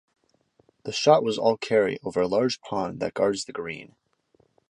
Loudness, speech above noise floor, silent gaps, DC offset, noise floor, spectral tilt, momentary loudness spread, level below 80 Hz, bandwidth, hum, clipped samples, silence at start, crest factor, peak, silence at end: -25 LUFS; 42 dB; none; under 0.1%; -66 dBFS; -4.5 dB/octave; 14 LU; -64 dBFS; 11 kHz; none; under 0.1%; 0.85 s; 22 dB; -4 dBFS; 0.85 s